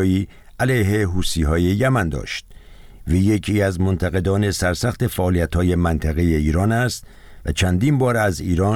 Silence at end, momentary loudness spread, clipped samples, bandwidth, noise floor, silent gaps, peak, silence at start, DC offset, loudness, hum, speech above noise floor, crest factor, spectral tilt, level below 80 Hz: 0 s; 7 LU; under 0.1%; 16.5 kHz; -41 dBFS; none; -6 dBFS; 0 s; under 0.1%; -20 LUFS; none; 22 dB; 12 dB; -6 dB/octave; -30 dBFS